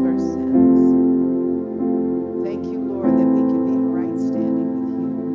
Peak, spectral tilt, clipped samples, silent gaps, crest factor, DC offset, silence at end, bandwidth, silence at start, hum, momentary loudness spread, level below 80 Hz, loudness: -6 dBFS; -10 dB/octave; under 0.1%; none; 12 dB; under 0.1%; 0 s; 6.2 kHz; 0 s; none; 10 LU; -50 dBFS; -19 LUFS